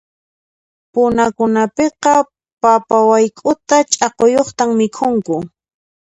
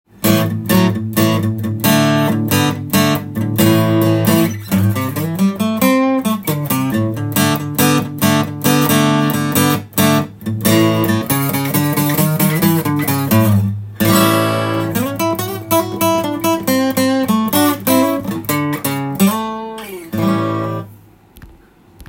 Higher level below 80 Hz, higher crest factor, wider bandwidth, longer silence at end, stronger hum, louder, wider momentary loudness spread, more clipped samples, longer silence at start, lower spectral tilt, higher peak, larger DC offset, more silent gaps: about the same, -52 dBFS vs -50 dBFS; about the same, 14 dB vs 16 dB; second, 10.5 kHz vs 17 kHz; first, 0.7 s vs 0.05 s; neither; about the same, -14 LUFS vs -15 LUFS; about the same, 8 LU vs 6 LU; neither; first, 0.95 s vs 0.2 s; about the same, -4 dB/octave vs -5 dB/octave; about the same, 0 dBFS vs 0 dBFS; neither; first, 2.53-2.57 s vs none